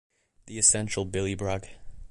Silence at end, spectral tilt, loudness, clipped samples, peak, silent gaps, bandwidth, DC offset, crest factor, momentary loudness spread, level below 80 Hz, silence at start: 0.05 s; -3 dB/octave; -25 LUFS; under 0.1%; -6 dBFS; none; 11.5 kHz; under 0.1%; 24 dB; 14 LU; -48 dBFS; 0.45 s